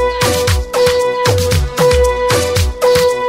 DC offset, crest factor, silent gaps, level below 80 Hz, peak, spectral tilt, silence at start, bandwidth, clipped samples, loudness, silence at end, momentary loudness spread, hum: under 0.1%; 12 dB; none; -22 dBFS; 0 dBFS; -4 dB/octave; 0 s; 16.5 kHz; under 0.1%; -13 LUFS; 0 s; 3 LU; none